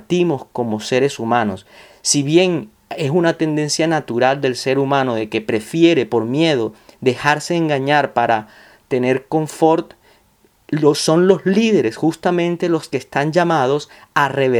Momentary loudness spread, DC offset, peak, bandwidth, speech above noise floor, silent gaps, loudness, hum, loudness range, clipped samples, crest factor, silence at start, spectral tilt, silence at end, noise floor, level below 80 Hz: 8 LU; under 0.1%; 0 dBFS; 13.5 kHz; 39 dB; none; -17 LUFS; none; 2 LU; under 0.1%; 18 dB; 0.1 s; -5 dB/octave; 0 s; -56 dBFS; -60 dBFS